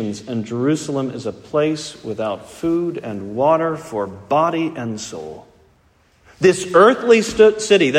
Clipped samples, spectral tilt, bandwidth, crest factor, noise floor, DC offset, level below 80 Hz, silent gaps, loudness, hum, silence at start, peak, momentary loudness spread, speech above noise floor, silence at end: under 0.1%; -5 dB/octave; 12.5 kHz; 18 dB; -56 dBFS; under 0.1%; -54 dBFS; none; -18 LUFS; none; 0 s; 0 dBFS; 15 LU; 39 dB; 0 s